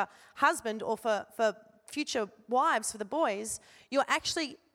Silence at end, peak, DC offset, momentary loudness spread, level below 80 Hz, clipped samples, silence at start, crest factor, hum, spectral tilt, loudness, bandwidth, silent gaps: 0.2 s; -12 dBFS; under 0.1%; 9 LU; -70 dBFS; under 0.1%; 0 s; 20 dB; none; -2 dB/octave; -31 LUFS; 17 kHz; none